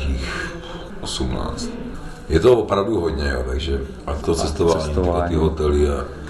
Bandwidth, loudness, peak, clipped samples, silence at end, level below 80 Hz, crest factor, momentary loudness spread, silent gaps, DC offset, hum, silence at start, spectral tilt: 12 kHz; -21 LUFS; -4 dBFS; under 0.1%; 0 s; -28 dBFS; 16 dB; 13 LU; none; 0.3%; none; 0 s; -6 dB/octave